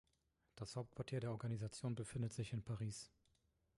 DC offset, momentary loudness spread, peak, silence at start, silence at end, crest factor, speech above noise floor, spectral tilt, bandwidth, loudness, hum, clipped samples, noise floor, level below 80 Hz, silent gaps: under 0.1%; 7 LU; -32 dBFS; 0.55 s; 0.7 s; 16 dB; 37 dB; -6 dB/octave; 11.5 kHz; -47 LUFS; none; under 0.1%; -83 dBFS; -70 dBFS; none